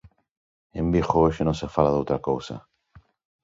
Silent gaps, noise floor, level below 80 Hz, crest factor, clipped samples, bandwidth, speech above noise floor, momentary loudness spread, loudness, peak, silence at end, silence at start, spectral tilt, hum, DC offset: none; -56 dBFS; -42 dBFS; 22 dB; under 0.1%; 7.8 kHz; 33 dB; 17 LU; -24 LUFS; -4 dBFS; 0.85 s; 0.75 s; -7.5 dB/octave; none; under 0.1%